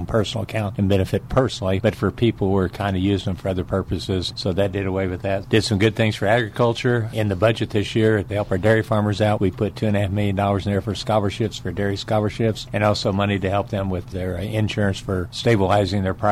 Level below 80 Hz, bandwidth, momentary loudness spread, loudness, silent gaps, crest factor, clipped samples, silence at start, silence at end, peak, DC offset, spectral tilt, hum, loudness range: -42 dBFS; 13.5 kHz; 6 LU; -21 LUFS; none; 16 dB; under 0.1%; 0 s; 0 s; -4 dBFS; under 0.1%; -6.5 dB/octave; none; 2 LU